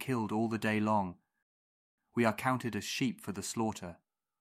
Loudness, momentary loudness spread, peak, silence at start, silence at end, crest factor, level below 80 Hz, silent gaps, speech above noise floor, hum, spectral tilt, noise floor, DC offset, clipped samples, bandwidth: -34 LUFS; 10 LU; -12 dBFS; 0 s; 0.45 s; 22 dB; -72 dBFS; 1.42-1.98 s; over 57 dB; none; -5 dB/octave; under -90 dBFS; under 0.1%; under 0.1%; 16 kHz